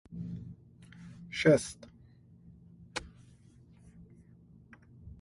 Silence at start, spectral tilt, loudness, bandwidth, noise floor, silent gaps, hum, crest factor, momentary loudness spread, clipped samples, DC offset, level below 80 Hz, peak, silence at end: 0.1 s; -5.5 dB/octave; -32 LUFS; 11.5 kHz; -59 dBFS; none; none; 24 dB; 30 LU; under 0.1%; under 0.1%; -60 dBFS; -12 dBFS; 0.1 s